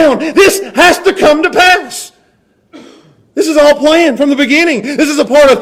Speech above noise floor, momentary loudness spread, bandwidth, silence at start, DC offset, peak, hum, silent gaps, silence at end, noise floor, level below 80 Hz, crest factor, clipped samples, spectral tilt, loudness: 45 dB; 8 LU; 16.5 kHz; 0 s; under 0.1%; 0 dBFS; none; none; 0 s; -53 dBFS; -42 dBFS; 10 dB; 0.5%; -2.5 dB/octave; -8 LUFS